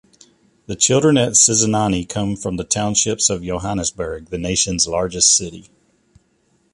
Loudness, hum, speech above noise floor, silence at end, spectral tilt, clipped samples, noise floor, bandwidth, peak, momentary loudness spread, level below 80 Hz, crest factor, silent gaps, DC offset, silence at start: -16 LUFS; none; 44 dB; 1.1 s; -3 dB/octave; under 0.1%; -62 dBFS; 11.5 kHz; 0 dBFS; 13 LU; -42 dBFS; 18 dB; none; under 0.1%; 0.7 s